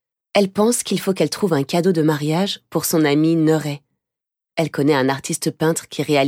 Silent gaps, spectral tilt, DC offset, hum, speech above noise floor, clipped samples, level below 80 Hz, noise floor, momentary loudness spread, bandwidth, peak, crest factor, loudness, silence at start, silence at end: none; -5 dB/octave; under 0.1%; none; 68 dB; under 0.1%; -64 dBFS; -86 dBFS; 7 LU; 17 kHz; -2 dBFS; 16 dB; -19 LUFS; 0.35 s; 0 s